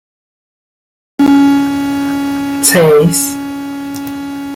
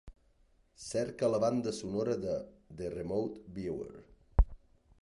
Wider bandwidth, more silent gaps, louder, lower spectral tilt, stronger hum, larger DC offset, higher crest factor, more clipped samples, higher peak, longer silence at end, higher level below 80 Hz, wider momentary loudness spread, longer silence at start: first, 16.5 kHz vs 11.5 kHz; neither; first, -12 LUFS vs -35 LUFS; second, -4.5 dB/octave vs -6.5 dB/octave; neither; neither; second, 14 dB vs 22 dB; neither; first, 0 dBFS vs -12 dBFS; second, 0 s vs 0.45 s; second, -48 dBFS vs -40 dBFS; about the same, 14 LU vs 12 LU; first, 1.2 s vs 0.05 s